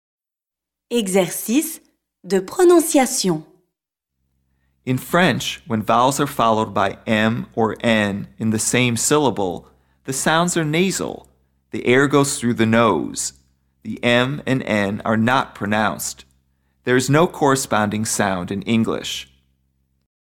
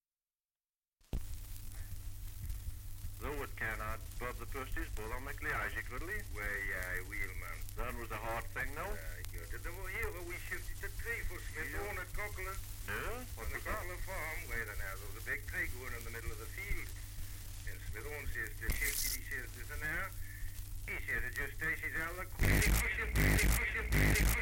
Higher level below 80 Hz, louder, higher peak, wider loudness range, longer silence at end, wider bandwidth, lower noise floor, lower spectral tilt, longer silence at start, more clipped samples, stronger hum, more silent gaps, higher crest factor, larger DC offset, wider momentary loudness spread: second, -54 dBFS vs -42 dBFS; first, -19 LUFS vs -39 LUFS; first, -4 dBFS vs -16 dBFS; second, 2 LU vs 8 LU; first, 0.95 s vs 0 s; about the same, 17.5 kHz vs 17 kHz; about the same, -88 dBFS vs under -90 dBFS; about the same, -4.5 dB/octave vs -4 dB/octave; second, 0.9 s vs 1.15 s; neither; neither; neither; second, 16 dB vs 22 dB; neither; second, 11 LU vs 15 LU